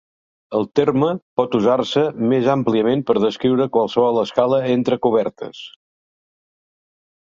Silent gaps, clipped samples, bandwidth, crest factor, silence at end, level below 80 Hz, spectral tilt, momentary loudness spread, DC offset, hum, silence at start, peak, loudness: 1.22-1.37 s; under 0.1%; 7.4 kHz; 18 dB; 1.7 s; -60 dBFS; -7 dB/octave; 7 LU; under 0.1%; none; 0.5 s; -2 dBFS; -18 LUFS